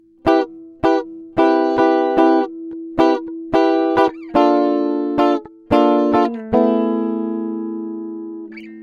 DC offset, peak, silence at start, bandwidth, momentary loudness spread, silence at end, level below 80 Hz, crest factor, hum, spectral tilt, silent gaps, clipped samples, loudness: under 0.1%; 0 dBFS; 0.25 s; 6.8 kHz; 13 LU; 0 s; -50 dBFS; 16 dB; none; -7 dB/octave; none; under 0.1%; -17 LUFS